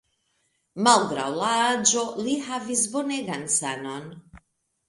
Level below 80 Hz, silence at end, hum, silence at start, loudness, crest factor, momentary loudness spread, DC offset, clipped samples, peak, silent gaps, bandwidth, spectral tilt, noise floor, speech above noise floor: -64 dBFS; 0.5 s; none; 0.75 s; -23 LUFS; 24 dB; 15 LU; under 0.1%; under 0.1%; -2 dBFS; none; 11.5 kHz; -2 dB/octave; -72 dBFS; 47 dB